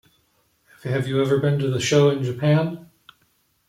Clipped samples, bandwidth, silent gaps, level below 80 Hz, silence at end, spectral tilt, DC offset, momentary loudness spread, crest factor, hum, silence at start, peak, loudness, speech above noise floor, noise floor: under 0.1%; 13.5 kHz; none; -60 dBFS; 0.85 s; -6 dB/octave; under 0.1%; 11 LU; 16 dB; none; 0.85 s; -6 dBFS; -21 LUFS; 45 dB; -65 dBFS